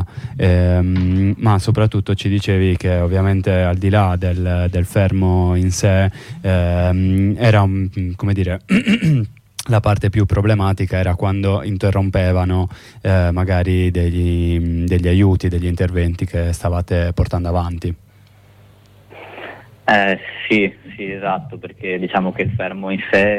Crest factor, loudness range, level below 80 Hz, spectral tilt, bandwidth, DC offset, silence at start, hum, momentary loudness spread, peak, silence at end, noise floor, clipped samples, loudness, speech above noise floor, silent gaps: 12 dB; 5 LU; -32 dBFS; -7 dB/octave; 12 kHz; under 0.1%; 0 s; none; 9 LU; -4 dBFS; 0 s; -47 dBFS; under 0.1%; -17 LUFS; 31 dB; none